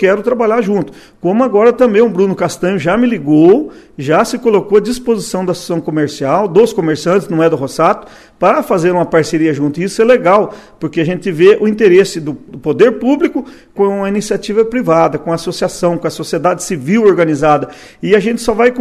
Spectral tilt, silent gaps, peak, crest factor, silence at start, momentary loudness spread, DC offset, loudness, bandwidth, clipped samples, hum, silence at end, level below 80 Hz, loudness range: -6 dB/octave; none; 0 dBFS; 12 dB; 0 s; 9 LU; under 0.1%; -12 LUFS; 14 kHz; 0.2%; none; 0 s; -48 dBFS; 3 LU